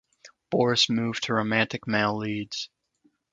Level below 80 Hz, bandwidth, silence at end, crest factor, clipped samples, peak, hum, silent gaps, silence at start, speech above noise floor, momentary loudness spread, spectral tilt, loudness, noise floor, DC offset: -64 dBFS; 9 kHz; 0.65 s; 22 dB; under 0.1%; -6 dBFS; none; none; 0.25 s; 43 dB; 11 LU; -4 dB/octave; -25 LUFS; -68 dBFS; under 0.1%